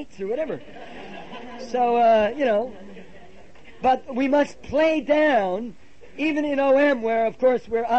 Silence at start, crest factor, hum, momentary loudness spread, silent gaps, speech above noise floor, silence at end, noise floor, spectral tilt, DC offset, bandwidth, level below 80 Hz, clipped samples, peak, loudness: 0 s; 14 dB; none; 20 LU; none; 27 dB; 0 s; -48 dBFS; -5.5 dB/octave; 0.8%; 8.4 kHz; -54 dBFS; under 0.1%; -8 dBFS; -22 LUFS